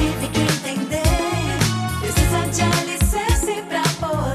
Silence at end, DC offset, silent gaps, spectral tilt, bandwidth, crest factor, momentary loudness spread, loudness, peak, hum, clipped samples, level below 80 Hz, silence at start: 0 s; under 0.1%; none; -4.5 dB/octave; 15.5 kHz; 14 dB; 4 LU; -20 LUFS; -4 dBFS; none; under 0.1%; -28 dBFS; 0 s